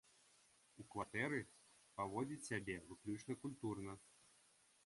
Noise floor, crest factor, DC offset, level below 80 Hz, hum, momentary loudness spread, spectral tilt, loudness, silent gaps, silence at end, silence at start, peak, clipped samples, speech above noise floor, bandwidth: -74 dBFS; 20 dB; under 0.1%; -74 dBFS; none; 16 LU; -5.5 dB/octave; -47 LUFS; none; 0.75 s; 0.75 s; -28 dBFS; under 0.1%; 27 dB; 11.5 kHz